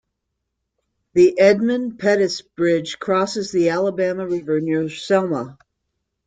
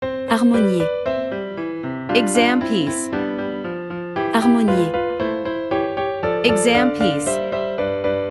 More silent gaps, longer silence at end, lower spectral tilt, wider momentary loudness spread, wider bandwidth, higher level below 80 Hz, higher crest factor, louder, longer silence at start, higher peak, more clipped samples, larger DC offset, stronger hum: neither; first, 0.75 s vs 0 s; about the same, -5.5 dB/octave vs -4.5 dB/octave; second, 8 LU vs 11 LU; second, 9.2 kHz vs 12 kHz; second, -62 dBFS vs -50 dBFS; about the same, 18 dB vs 18 dB; about the same, -19 LUFS vs -20 LUFS; first, 1.15 s vs 0 s; about the same, -2 dBFS vs -2 dBFS; neither; neither; neither